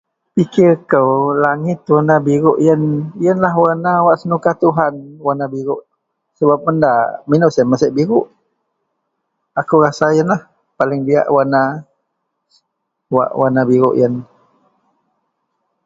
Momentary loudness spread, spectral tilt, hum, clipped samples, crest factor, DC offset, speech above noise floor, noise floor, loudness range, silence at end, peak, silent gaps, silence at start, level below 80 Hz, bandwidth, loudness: 8 LU; -8 dB/octave; none; under 0.1%; 14 dB; under 0.1%; 60 dB; -73 dBFS; 4 LU; 1.6 s; 0 dBFS; none; 0.35 s; -58 dBFS; 7.6 kHz; -14 LUFS